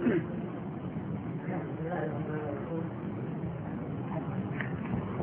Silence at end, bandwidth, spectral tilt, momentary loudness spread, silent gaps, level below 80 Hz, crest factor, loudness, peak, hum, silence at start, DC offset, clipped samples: 0 s; 3.6 kHz; -8 dB/octave; 3 LU; none; -58 dBFS; 18 dB; -36 LUFS; -18 dBFS; none; 0 s; under 0.1%; under 0.1%